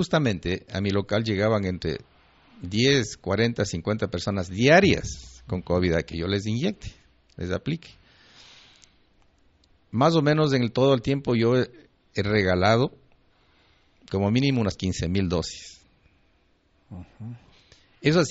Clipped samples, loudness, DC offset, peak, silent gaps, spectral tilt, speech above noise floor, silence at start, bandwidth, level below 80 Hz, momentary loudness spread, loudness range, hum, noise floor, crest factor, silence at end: under 0.1%; -24 LUFS; under 0.1%; -6 dBFS; none; -5 dB/octave; 41 dB; 0 s; 8 kHz; -48 dBFS; 16 LU; 9 LU; none; -64 dBFS; 20 dB; 0 s